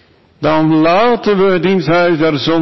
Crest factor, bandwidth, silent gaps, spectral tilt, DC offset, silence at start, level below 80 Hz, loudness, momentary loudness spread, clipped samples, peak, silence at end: 8 dB; 6 kHz; none; -7 dB/octave; under 0.1%; 0 s; -46 dBFS; -12 LUFS; 3 LU; under 0.1%; -4 dBFS; 0 s